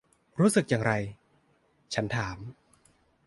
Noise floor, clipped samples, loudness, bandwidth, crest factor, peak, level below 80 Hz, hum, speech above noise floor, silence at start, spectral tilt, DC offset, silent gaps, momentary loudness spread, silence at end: -68 dBFS; under 0.1%; -28 LUFS; 12 kHz; 20 dB; -10 dBFS; -58 dBFS; none; 40 dB; 0.35 s; -5.5 dB/octave; under 0.1%; none; 18 LU; 0.75 s